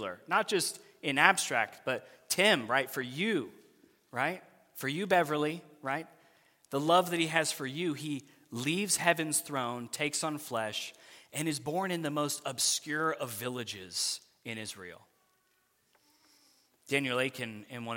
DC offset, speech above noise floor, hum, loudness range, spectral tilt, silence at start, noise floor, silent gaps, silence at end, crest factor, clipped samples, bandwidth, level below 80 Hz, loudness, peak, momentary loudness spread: under 0.1%; 41 dB; none; 8 LU; -3 dB/octave; 0 s; -73 dBFS; none; 0 s; 28 dB; under 0.1%; 17 kHz; -80 dBFS; -31 LUFS; -6 dBFS; 14 LU